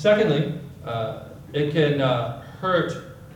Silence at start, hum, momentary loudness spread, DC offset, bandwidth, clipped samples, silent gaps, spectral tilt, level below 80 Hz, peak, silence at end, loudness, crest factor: 0 s; none; 12 LU; under 0.1%; 17 kHz; under 0.1%; none; -7 dB/octave; -56 dBFS; -6 dBFS; 0 s; -24 LUFS; 18 dB